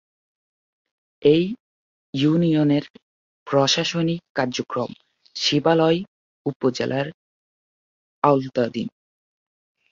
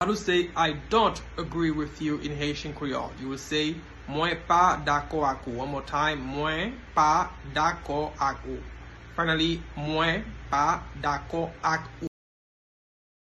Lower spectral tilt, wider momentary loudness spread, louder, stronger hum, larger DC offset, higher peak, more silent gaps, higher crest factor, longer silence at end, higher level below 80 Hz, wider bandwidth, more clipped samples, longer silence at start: about the same, -5.5 dB/octave vs -4.5 dB/octave; about the same, 13 LU vs 12 LU; first, -22 LUFS vs -27 LUFS; neither; neither; first, -2 dBFS vs -8 dBFS; first, 1.60-2.13 s, 2.90-2.94 s, 3.02-3.46 s, 4.30-4.35 s, 6.08-6.45 s, 6.56-6.60 s, 7.14-8.22 s vs none; about the same, 22 dB vs 20 dB; second, 1.05 s vs 1.3 s; second, -62 dBFS vs -46 dBFS; second, 7.6 kHz vs 12 kHz; neither; first, 1.2 s vs 0 s